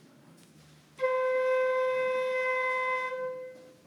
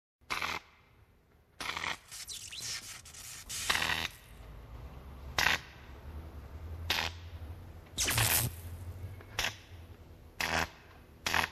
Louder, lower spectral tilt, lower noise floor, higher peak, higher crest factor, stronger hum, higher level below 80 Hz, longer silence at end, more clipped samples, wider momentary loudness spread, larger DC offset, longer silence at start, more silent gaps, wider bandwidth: first, -29 LUFS vs -34 LUFS; first, -3 dB/octave vs -1.5 dB/octave; second, -57 dBFS vs -65 dBFS; second, -18 dBFS vs -12 dBFS; second, 12 dB vs 26 dB; neither; second, -82 dBFS vs -52 dBFS; first, 0.15 s vs 0 s; neither; second, 10 LU vs 21 LU; neither; first, 1 s vs 0.3 s; neither; second, 12 kHz vs 14 kHz